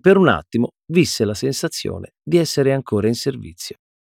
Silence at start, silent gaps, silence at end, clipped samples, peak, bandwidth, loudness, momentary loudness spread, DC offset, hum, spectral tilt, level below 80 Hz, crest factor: 0.05 s; none; 0.3 s; under 0.1%; -2 dBFS; 16.5 kHz; -19 LUFS; 15 LU; under 0.1%; none; -5.5 dB/octave; -52 dBFS; 18 dB